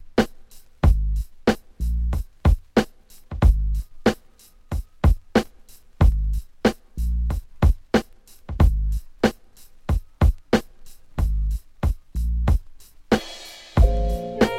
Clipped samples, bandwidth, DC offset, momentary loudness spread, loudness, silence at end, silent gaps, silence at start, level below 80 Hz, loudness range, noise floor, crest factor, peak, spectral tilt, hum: under 0.1%; 14 kHz; under 0.1%; 10 LU; -24 LUFS; 0 s; none; 0 s; -24 dBFS; 2 LU; -50 dBFS; 18 dB; -4 dBFS; -7 dB/octave; none